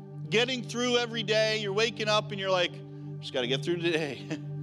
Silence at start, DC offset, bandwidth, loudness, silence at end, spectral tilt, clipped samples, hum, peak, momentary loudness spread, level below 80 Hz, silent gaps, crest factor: 0 s; under 0.1%; 12.5 kHz; -28 LUFS; 0 s; -4 dB/octave; under 0.1%; 50 Hz at -55 dBFS; -12 dBFS; 11 LU; -84 dBFS; none; 18 dB